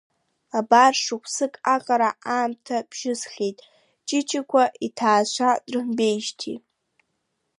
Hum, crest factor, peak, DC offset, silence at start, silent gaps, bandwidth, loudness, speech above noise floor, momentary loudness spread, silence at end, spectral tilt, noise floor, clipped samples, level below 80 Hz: none; 22 dB; -2 dBFS; under 0.1%; 0.55 s; none; 11.5 kHz; -22 LUFS; 53 dB; 11 LU; 1 s; -2.5 dB/octave; -75 dBFS; under 0.1%; -78 dBFS